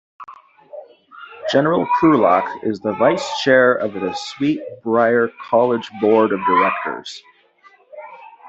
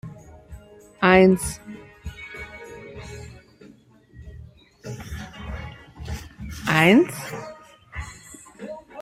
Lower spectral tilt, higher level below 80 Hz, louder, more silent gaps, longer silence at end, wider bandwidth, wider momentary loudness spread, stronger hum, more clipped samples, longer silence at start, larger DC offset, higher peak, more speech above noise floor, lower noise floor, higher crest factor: about the same, -5.5 dB/octave vs -5.5 dB/octave; second, -62 dBFS vs -44 dBFS; about the same, -17 LUFS vs -19 LUFS; neither; about the same, 0 s vs 0 s; second, 8.2 kHz vs 16 kHz; second, 18 LU vs 27 LU; neither; neither; first, 0.2 s vs 0.05 s; neither; about the same, -2 dBFS vs -2 dBFS; about the same, 35 dB vs 34 dB; about the same, -52 dBFS vs -52 dBFS; second, 16 dB vs 22 dB